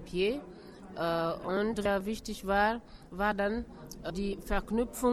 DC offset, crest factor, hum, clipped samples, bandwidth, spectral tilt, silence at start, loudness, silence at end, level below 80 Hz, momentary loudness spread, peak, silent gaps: under 0.1%; 16 dB; none; under 0.1%; 15 kHz; -5 dB/octave; 0 s; -33 LUFS; 0 s; -46 dBFS; 14 LU; -16 dBFS; none